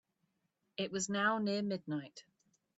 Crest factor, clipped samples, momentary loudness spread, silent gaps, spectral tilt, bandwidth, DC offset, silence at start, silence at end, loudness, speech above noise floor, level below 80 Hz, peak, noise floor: 20 dB; under 0.1%; 13 LU; none; -4 dB/octave; 8 kHz; under 0.1%; 0.8 s; 0.55 s; -36 LUFS; 46 dB; -80 dBFS; -20 dBFS; -82 dBFS